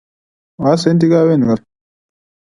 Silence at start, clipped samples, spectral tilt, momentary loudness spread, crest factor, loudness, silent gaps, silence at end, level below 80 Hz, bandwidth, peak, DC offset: 0.6 s; under 0.1%; -7.5 dB/octave; 7 LU; 16 dB; -13 LUFS; none; 0.95 s; -52 dBFS; 11 kHz; 0 dBFS; under 0.1%